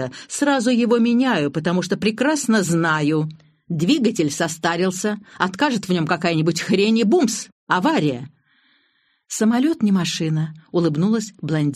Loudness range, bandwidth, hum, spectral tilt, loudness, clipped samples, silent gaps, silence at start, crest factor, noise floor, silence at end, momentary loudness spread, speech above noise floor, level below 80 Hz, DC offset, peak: 3 LU; 13.5 kHz; none; -5 dB/octave; -20 LUFS; under 0.1%; 7.52-7.67 s; 0 s; 16 dB; -64 dBFS; 0 s; 7 LU; 45 dB; -62 dBFS; under 0.1%; -2 dBFS